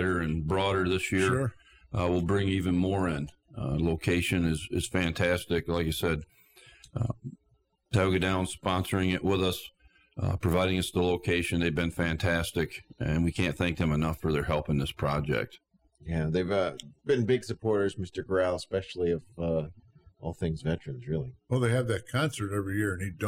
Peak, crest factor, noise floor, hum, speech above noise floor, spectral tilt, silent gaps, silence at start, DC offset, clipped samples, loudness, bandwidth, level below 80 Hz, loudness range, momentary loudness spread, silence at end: -14 dBFS; 14 dB; -70 dBFS; none; 42 dB; -6 dB/octave; none; 0 s; under 0.1%; under 0.1%; -29 LUFS; 16 kHz; -46 dBFS; 3 LU; 8 LU; 0 s